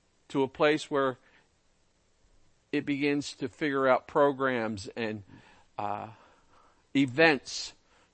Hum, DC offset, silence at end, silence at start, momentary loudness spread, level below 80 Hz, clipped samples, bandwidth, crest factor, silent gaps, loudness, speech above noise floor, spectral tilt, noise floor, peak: none; under 0.1%; 0.45 s; 0.3 s; 15 LU; -68 dBFS; under 0.1%; 8.8 kHz; 24 dB; none; -29 LUFS; 40 dB; -5 dB/octave; -68 dBFS; -6 dBFS